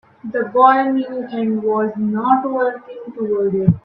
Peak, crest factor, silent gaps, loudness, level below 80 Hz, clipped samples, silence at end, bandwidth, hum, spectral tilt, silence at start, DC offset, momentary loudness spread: 0 dBFS; 16 dB; none; -17 LUFS; -52 dBFS; under 0.1%; 0.05 s; 5.2 kHz; none; -11 dB/octave; 0.25 s; under 0.1%; 13 LU